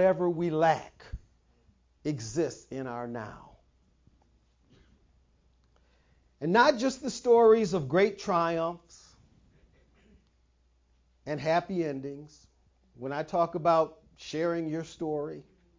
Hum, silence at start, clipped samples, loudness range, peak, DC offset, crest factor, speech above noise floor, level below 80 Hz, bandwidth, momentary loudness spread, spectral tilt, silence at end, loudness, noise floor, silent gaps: none; 0 s; under 0.1%; 12 LU; -8 dBFS; under 0.1%; 22 dB; 40 dB; -60 dBFS; 7.6 kHz; 20 LU; -5.5 dB/octave; 0.4 s; -28 LUFS; -68 dBFS; none